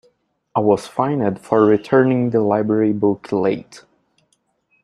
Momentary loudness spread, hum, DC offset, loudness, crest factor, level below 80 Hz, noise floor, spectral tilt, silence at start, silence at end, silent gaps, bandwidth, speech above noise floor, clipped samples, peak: 6 LU; none; under 0.1%; -18 LUFS; 18 dB; -60 dBFS; -65 dBFS; -8 dB/octave; 0.55 s; 1.05 s; none; 11.5 kHz; 49 dB; under 0.1%; 0 dBFS